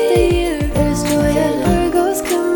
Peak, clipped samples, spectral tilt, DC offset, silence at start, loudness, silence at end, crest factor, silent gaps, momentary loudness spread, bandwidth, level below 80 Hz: -2 dBFS; under 0.1%; -5.5 dB/octave; under 0.1%; 0 s; -16 LUFS; 0 s; 12 dB; none; 3 LU; 19.5 kHz; -26 dBFS